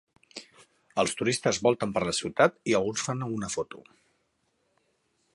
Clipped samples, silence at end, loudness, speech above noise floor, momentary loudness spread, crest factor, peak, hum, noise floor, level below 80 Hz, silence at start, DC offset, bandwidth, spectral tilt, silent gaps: under 0.1%; 1.55 s; -27 LUFS; 46 dB; 20 LU; 24 dB; -6 dBFS; none; -74 dBFS; -62 dBFS; 0.35 s; under 0.1%; 11.5 kHz; -4 dB/octave; none